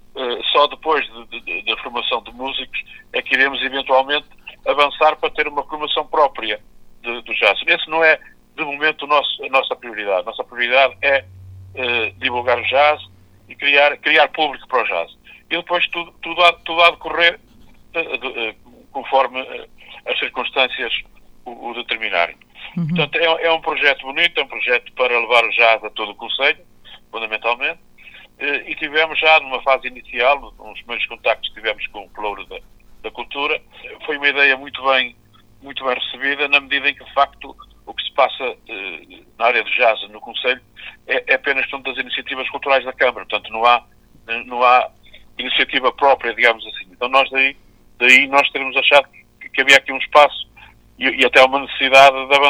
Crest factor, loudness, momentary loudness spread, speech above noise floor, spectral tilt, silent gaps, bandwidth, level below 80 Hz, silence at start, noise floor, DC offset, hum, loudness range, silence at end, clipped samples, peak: 18 dB; -17 LUFS; 15 LU; 28 dB; -3 dB/octave; none; 16.5 kHz; -52 dBFS; 0.15 s; -46 dBFS; under 0.1%; none; 7 LU; 0 s; under 0.1%; 0 dBFS